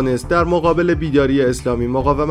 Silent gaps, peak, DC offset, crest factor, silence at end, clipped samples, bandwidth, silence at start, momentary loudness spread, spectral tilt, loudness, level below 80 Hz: none; -2 dBFS; under 0.1%; 14 dB; 0 s; under 0.1%; 15 kHz; 0 s; 3 LU; -7 dB/octave; -16 LUFS; -30 dBFS